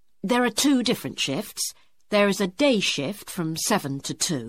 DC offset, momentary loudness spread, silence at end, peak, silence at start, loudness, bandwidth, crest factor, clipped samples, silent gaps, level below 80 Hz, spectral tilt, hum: 0.2%; 9 LU; 0 s; -8 dBFS; 0.25 s; -24 LUFS; 16.5 kHz; 18 dB; under 0.1%; none; -62 dBFS; -3.5 dB/octave; none